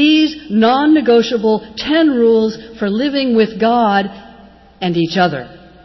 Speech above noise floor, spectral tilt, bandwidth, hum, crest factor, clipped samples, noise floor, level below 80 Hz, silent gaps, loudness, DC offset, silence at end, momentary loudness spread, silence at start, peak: 28 dB; -6 dB/octave; 6.2 kHz; none; 12 dB; under 0.1%; -41 dBFS; -48 dBFS; none; -14 LUFS; under 0.1%; 0.25 s; 8 LU; 0 s; -2 dBFS